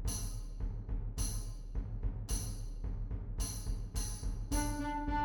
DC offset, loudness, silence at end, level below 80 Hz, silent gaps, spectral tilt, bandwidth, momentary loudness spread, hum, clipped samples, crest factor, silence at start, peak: under 0.1%; -41 LUFS; 0 s; -40 dBFS; none; -4.5 dB/octave; 18.5 kHz; 7 LU; none; under 0.1%; 16 dB; 0 s; -22 dBFS